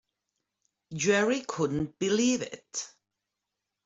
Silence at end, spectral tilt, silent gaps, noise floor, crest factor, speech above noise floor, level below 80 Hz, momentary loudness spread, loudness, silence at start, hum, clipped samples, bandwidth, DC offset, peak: 0.95 s; -4 dB/octave; none; -86 dBFS; 20 dB; 58 dB; -62 dBFS; 12 LU; -29 LUFS; 0.9 s; none; under 0.1%; 8 kHz; under 0.1%; -12 dBFS